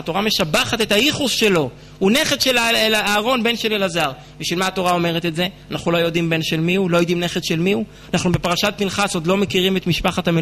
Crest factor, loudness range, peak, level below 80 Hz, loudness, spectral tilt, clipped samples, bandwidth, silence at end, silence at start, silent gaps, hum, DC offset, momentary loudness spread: 14 dB; 3 LU; -4 dBFS; -44 dBFS; -18 LUFS; -4 dB/octave; under 0.1%; 13.5 kHz; 0 s; 0 s; none; none; under 0.1%; 6 LU